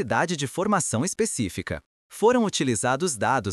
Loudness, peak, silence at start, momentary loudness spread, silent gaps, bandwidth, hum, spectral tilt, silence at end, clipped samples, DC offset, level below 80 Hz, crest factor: -24 LUFS; -8 dBFS; 0 s; 11 LU; 1.86-2.10 s; 13.5 kHz; none; -4 dB/octave; 0 s; under 0.1%; under 0.1%; -54 dBFS; 16 dB